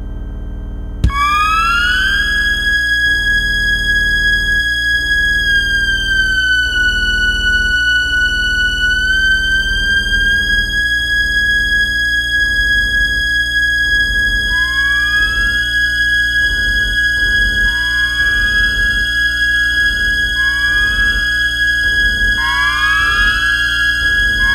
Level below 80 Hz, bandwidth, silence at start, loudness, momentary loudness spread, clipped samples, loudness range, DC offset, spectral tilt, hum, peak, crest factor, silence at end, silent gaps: -24 dBFS; 16 kHz; 0 s; -12 LUFS; 2 LU; under 0.1%; 0 LU; under 0.1%; -2 dB/octave; none; 0 dBFS; 14 dB; 0 s; none